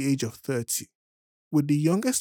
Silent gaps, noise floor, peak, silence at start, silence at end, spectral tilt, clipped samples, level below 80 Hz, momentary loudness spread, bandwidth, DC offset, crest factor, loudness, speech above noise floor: 0.95-1.51 s; under -90 dBFS; -12 dBFS; 0 s; 0 s; -5 dB/octave; under 0.1%; -74 dBFS; 7 LU; over 20 kHz; under 0.1%; 16 dB; -26 LUFS; over 65 dB